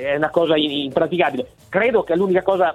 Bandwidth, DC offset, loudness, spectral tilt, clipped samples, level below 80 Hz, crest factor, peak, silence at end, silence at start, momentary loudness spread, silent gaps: 12.5 kHz; under 0.1%; -19 LUFS; -6.5 dB/octave; under 0.1%; -54 dBFS; 16 dB; -2 dBFS; 0 s; 0 s; 4 LU; none